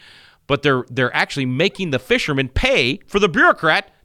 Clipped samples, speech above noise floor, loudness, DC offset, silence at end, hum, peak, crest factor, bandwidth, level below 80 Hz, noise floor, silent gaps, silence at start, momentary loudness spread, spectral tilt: under 0.1%; 28 dB; -17 LUFS; under 0.1%; 0.2 s; none; -2 dBFS; 16 dB; 15.5 kHz; -36 dBFS; -46 dBFS; none; 0.5 s; 6 LU; -5 dB/octave